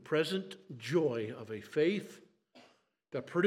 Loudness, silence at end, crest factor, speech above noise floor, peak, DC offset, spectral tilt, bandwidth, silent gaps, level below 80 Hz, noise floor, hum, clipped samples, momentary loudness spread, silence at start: -35 LUFS; 0 s; 18 dB; 34 dB; -16 dBFS; under 0.1%; -6 dB/octave; 15 kHz; none; -88 dBFS; -68 dBFS; none; under 0.1%; 13 LU; 0.05 s